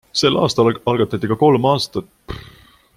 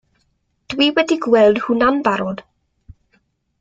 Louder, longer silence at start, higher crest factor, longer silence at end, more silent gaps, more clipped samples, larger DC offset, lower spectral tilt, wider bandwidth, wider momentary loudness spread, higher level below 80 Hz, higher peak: about the same, -16 LUFS vs -16 LUFS; second, 0.15 s vs 0.7 s; about the same, 16 dB vs 18 dB; second, 0.55 s vs 1.2 s; neither; neither; neither; about the same, -5.5 dB/octave vs -5 dB/octave; first, 16 kHz vs 7.8 kHz; first, 20 LU vs 14 LU; first, -46 dBFS vs -52 dBFS; about the same, -2 dBFS vs -2 dBFS